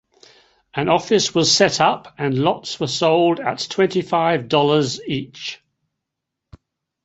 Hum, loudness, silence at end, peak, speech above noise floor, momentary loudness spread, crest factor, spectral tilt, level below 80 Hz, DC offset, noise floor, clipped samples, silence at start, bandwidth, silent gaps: none; -18 LUFS; 1.5 s; -2 dBFS; 63 dB; 11 LU; 18 dB; -4 dB/octave; -58 dBFS; under 0.1%; -81 dBFS; under 0.1%; 0.75 s; 8.2 kHz; none